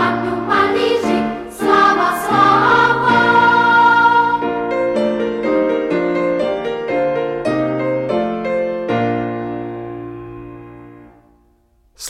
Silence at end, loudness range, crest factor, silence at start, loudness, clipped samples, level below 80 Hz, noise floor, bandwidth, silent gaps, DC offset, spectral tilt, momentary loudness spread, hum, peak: 0 s; 10 LU; 14 dB; 0 s; -15 LUFS; under 0.1%; -48 dBFS; -56 dBFS; 15.5 kHz; none; under 0.1%; -5.5 dB/octave; 14 LU; none; -2 dBFS